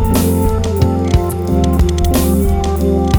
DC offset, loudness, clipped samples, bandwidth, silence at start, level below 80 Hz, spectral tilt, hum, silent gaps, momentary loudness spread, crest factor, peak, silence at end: under 0.1%; -14 LUFS; under 0.1%; over 20 kHz; 0 s; -18 dBFS; -6.5 dB/octave; none; none; 2 LU; 12 dB; 0 dBFS; 0 s